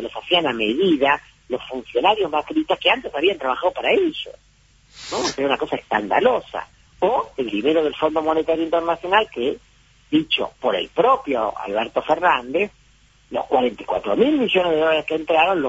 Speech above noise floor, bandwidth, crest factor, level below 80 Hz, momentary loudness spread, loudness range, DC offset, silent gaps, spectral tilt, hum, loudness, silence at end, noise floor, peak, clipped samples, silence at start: 34 dB; 8 kHz; 18 dB; -54 dBFS; 8 LU; 2 LU; under 0.1%; none; -4 dB/octave; none; -20 LUFS; 0 s; -54 dBFS; -4 dBFS; under 0.1%; 0 s